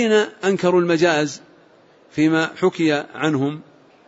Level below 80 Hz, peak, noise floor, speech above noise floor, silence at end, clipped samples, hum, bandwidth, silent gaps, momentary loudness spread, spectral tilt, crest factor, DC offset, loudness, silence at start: -64 dBFS; -4 dBFS; -52 dBFS; 33 dB; 0.45 s; under 0.1%; none; 8 kHz; none; 9 LU; -5.5 dB/octave; 16 dB; under 0.1%; -19 LUFS; 0 s